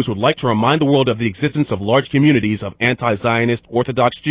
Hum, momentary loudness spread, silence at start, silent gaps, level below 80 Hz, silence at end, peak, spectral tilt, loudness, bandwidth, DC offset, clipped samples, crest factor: none; 6 LU; 0 s; none; -46 dBFS; 0 s; -2 dBFS; -10.5 dB/octave; -16 LUFS; 4 kHz; under 0.1%; under 0.1%; 14 dB